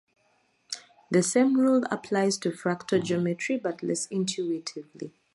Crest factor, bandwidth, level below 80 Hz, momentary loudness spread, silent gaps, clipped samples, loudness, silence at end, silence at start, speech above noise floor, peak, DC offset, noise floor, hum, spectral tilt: 18 dB; 11.5 kHz; -74 dBFS; 16 LU; none; under 0.1%; -27 LUFS; 0.25 s; 0.7 s; 42 dB; -10 dBFS; under 0.1%; -68 dBFS; none; -4.5 dB/octave